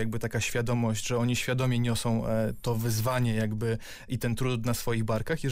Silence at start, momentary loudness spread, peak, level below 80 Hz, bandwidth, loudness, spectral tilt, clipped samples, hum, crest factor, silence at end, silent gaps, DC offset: 0 s; 4 LU; -18 dBFS; -46 dBFS; 16 kHz; -29 LUFS; -5.5 dB/octave; under 0.1%; none; 10 dB; 0 s; none; under 0.1%